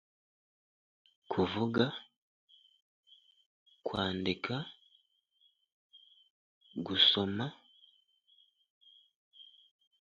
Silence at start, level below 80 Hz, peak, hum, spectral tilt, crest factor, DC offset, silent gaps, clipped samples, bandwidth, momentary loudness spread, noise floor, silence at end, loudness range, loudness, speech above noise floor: 1.3 s; -66 dBFS; -12 dBFS; none; -2.5 dB/octave; 26 dB; under 0.1%; 2.17-2.48 s, 2.82-3.03 s, 3.46-3.66 s, 5.72-5.90 s, 6.30-6.61 s, 8.70-8.81 s, 9.16-9.31 s; under 0.1%; 7.4 kHz; 22 LU; -73 dBFS; 0.75 s; 7 LU; -32 LUFS; 41 dB